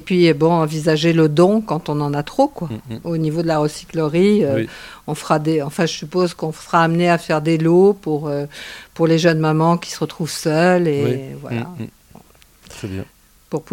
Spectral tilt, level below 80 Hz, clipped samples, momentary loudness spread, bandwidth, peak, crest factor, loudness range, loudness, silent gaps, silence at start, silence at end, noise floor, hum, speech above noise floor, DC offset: -6.5 dB/octave; -52 dBFS; under 0.1%; 15 LU; 16 kHz; 0 dBFS; 18 dB; 3 LU; -18 LUFS; none; 0 s; 0.1 s; -48 dBFS; none; 31 dB; under 0.1%